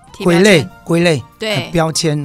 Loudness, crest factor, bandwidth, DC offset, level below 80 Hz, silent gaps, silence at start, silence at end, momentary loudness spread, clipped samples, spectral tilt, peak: -13 LUFS; 14 dB; 15.5 kHz; under 0.1%; -42 dBFS; none; 0.15 s; 0 s; 9 LU; under 0.1%; -5 dB/octave; 0 dBFS